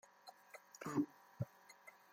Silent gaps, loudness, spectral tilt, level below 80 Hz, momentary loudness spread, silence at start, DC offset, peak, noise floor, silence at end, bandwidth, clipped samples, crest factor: none; -46 LUFS; -6.5 dB/octave; -80 dBFS; 19 LU; 0.25 s; under 0.1%; -26 dBFS; -64 dBFS; 0.2 s; 16.5 kHz; under 0.1%; 22 dB